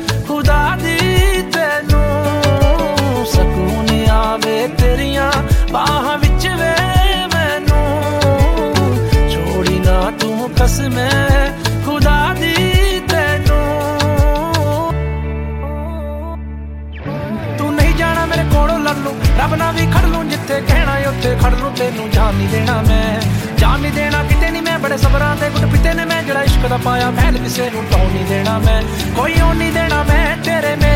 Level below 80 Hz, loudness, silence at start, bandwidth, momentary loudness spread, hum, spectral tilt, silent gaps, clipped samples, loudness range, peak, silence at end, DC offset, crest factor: -18 dBFS; -15 LUFS; 0 s; 16.5 kHz; 5 LU; none; -5.5 dB/octave; none; under 0.1%; 3 LU; -2 dBFS; 0 s; 0.2%; 12 dB